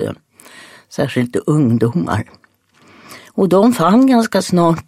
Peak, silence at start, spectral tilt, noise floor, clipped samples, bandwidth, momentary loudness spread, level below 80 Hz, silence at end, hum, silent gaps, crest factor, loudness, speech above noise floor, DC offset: 0 dBFS; 0 s; -6.5 dB/octave; -51 dBFS; under 0.1%; 15.5 kHz; 15 LU; -52 dBFS; 0.05 s; none; none; 14 dB; -14 LUFS; 38 dB; under 0.1%